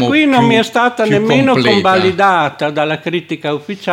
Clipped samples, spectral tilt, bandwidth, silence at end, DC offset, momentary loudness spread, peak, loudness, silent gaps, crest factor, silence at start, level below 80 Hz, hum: under 0.1%; -5.5 dB/octave; 16 kHz; 0 s; under 0.1%; 9 LU; 0 dBFS; -12 LUFS; none; 12 dB; 0 s; -54 dBFS; none